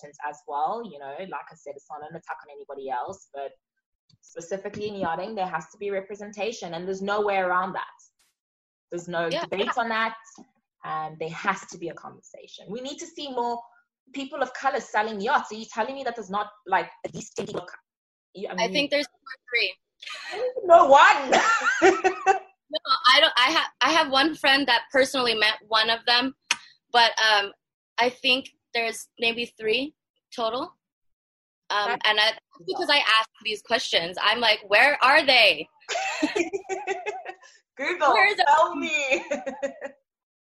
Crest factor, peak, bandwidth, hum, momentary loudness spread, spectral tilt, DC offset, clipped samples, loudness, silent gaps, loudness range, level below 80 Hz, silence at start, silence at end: 22 dB; -4 dBFS; 16 kHz; none; 20 LU; -2 dB/octave; under 0.1%; under 0.1%; -23 LUFS; 3.86-4.08 s, 8.40-8.88 s, 14.00-14.06 s, 17.97-18.33 s, 27.74-27.96 s, 30.10-30.14 s, 30.92-31.02 s, 31.13-31.62 s; 13 LU; -68 dBFS; 0.05 s; 0.5 s